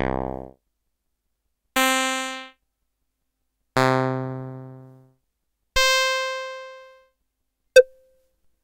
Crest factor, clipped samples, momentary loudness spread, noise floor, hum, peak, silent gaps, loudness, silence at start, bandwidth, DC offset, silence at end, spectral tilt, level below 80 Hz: 22 dB; under 0.1%; 21 LU; -77 dBFS; none; -2 dBFS; none; -21 LUFS; 0 s; 16.5 kHz; under 0.1%; 0.8 s; -3 dB/octave; -46 dBFS